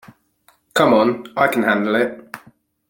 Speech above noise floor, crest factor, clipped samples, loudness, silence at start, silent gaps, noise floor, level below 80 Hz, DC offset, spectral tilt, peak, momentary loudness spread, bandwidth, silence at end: 42 dB; 18 dB; under 0.1%; -17 LUFS; 0.75 s; none; -58 dBFS; -60 dBFS; under 0.1%; -5 dB/octave; -2 dBFS; 21 LU; 17 kHz; 0.55 s